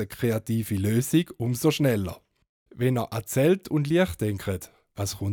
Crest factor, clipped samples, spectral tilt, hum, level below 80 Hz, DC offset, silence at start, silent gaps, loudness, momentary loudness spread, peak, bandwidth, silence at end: 16 dB; under 0.1%; -6 dB/octave; none; -54 dBFS; under 0.1%; 0 s; 2.49-2.66 s; -26 LUFS; 10 LU; -10 dBFS; over 20 kHz; 0 s